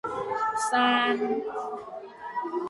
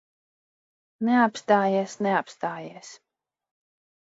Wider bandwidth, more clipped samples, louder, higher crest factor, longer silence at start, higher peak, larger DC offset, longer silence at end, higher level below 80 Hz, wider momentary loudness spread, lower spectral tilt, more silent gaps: first, 11.5 kHz vs 8 kHz; neither; second, -27 LUFS vs -24 LUFS; about the same, 18 dB vs 20 dB; second, 0.05 s vs 1 s; about the same, -10 dBFS vs -8 dBFS; neither; second, 0 s vs 1.1 s; first, -70 dBFS vs -78 dBFS; about the same, 15 LU vs 17 LU; second, -2.5 dB/octave vs -5.5 dB/octave; neither